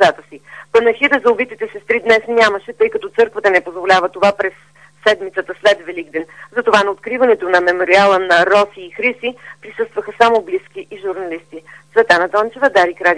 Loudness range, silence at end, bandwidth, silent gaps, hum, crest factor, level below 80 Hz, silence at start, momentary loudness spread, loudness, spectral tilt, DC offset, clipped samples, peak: 4 LU; 0 s; 10.5 kHz; none; none; 16 dB; -56 dBFS; 0 s; 13 LU; -14 LUFS; -3.5 dB/octave; 0.2%; under 0.1%; 0 dBFS